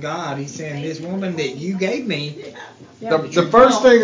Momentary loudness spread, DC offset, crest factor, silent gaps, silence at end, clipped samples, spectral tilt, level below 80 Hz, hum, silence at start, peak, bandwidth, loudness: 20 LU; under 0.1%; 16 dB; none; 0 s; under 0.1%; -5 dB/octave; -52 dBFS; none; 0 s; -2 dBFS; 7.6 kHz; -18 LUFS